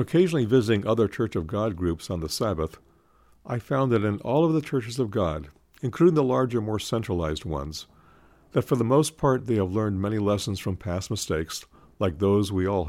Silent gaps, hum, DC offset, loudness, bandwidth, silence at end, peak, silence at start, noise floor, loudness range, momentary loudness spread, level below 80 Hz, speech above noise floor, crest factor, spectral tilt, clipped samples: none; none; under 0.1%; -25 LUFS; 16 kHz; 0 s; -8 dBFS; 0 s; -59 dBFS; 2 LU; 10 LU; -50 dBFS; 34 dB; 18 dB; -6.5 dB/octave; under 0.1%